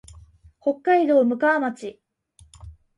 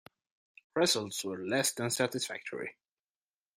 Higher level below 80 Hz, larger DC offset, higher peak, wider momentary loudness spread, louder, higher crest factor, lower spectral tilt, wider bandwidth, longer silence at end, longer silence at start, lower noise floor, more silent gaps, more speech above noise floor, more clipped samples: first, -54 dBFS vs -76 dBFS; neither; first, -8 dBFS vs -14 dBFS; first, 15 LU vs 12 LU; first, -21 LUFS vs -32 LUFS; about the same, 16 dB vs 20 dB; first, -6 dB/octave vs -2.5 dB/octave; second, 11.5 kHz vs 16 kHz; second, 0.25 s vs 0.85 s; about the same, 0.65 s vs 0.75 s; second, -56 dBFS vs under -90 dBFS; neither; second, 36 dB vs over 57 dB; neither